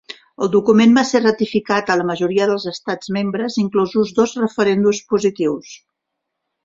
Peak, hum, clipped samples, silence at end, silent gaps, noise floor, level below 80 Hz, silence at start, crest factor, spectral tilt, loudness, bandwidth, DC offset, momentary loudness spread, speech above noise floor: -2 dBFS; none; under 0.1%; 0.9 s; none; -78 dBFS; -58 dBFS; 0.1 s; 16 dB; -5.5 dB/octave; -17 LUFS; 7.6 kHz; under 0.1%; 10 LU; 61 dB